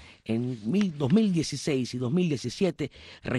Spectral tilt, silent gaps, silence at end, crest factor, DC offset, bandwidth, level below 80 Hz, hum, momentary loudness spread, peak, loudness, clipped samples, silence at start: -6.5 dB/octave; none; 0 s; 16 dB; under 0.1%; 12 kHz; -58 dBFS; none; 9 LU; -12 dBFS; -28 LUFS; under 0.1%; 0 s